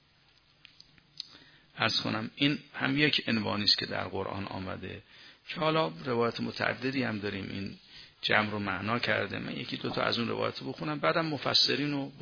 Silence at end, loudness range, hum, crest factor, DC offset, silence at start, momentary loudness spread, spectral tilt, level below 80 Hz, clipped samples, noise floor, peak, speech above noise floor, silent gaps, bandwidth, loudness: 0 s; 4 LU; none; 24 dB; under 0.1%; 1.15 s; 15 LU; -5 dB/octave; -66 dBFS; under 0.1%; -65 dBFS; -8 dBFS; 33 dB; none; 5.4 kHz; -30 LUFS